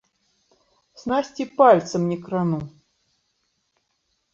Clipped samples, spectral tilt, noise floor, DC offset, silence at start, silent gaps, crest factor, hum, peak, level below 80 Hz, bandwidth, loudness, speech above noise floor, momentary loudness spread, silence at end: under 0.1%; -6.5 dB/octave; -72 dBFS; under 0.1%; 1.05 s; none; 22 dB; none; -2 dBFS; -62 dBFS; 7.6 kHz; -21 LUFS; 52 dB; 15 LU; 1.65 s